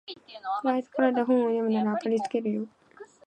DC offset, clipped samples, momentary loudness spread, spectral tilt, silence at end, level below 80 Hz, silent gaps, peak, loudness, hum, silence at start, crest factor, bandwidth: under 0.1%; under 0.1%; 12 LU; -7 dB/octave; 0.2 s; -80 dBFS; none; -10 dBFS; -27 LUFS; none; 0.1 s; 18 dB; 9 kHz